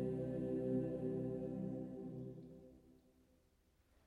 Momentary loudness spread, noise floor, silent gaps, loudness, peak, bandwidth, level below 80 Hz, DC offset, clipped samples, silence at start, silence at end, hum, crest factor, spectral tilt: 17 LU; -75 dBFS; none; -44 LUFS; -30 dBFS; 10.5 kHz; -68 dBFS; under 0.1%; under 0.1%; 0 s; 1.15 s; none; 16 dB; -10.5 dB/octave